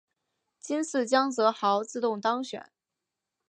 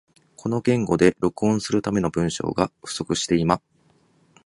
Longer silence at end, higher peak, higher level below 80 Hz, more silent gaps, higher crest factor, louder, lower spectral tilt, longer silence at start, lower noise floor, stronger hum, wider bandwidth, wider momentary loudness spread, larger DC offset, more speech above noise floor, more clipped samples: about the same, 0.85 s vs 0.85 s; second, -10 dBFS vs -2 dBFS; second, -86 dBFS vs -50 dBFS; neither; about the same, 20 dB vs 20 dB; second, -27 LUFS vs -23 LUFS; second, -3.5 dB/octave vs -5.5 dB/octave; first, 0.65 s vs 0.45 s; first, -87 dBFS vs -61 dBFS; neither; about the same, 10.5 kHz vs 11.5 kHz; first, 13 LU vs 7 LU; neither; first, 60 dB vs 39 dB; neither